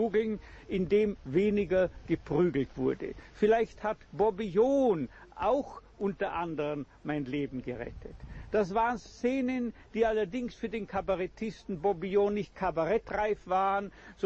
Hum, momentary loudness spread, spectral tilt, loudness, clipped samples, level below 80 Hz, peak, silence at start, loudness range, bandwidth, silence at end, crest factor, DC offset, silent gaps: none; 11 LU; -7.5 dB/octave; -31 LUFS; under 0.1%; -52 dBFS; -16 dBFS; 0 s; 4 LU; 7.8 kHz; 0 s; 16 dB; under 0.1%; none